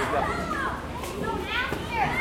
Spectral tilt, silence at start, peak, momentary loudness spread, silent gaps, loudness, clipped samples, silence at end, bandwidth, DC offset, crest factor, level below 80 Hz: -4.5 dB/octave; 0 s; -12 dBFS; 6 LU; none; -28 LUFS; under 0.1%; 0 s; 16.5 kHz; under 0.1%; 16 dB; -42 dBFS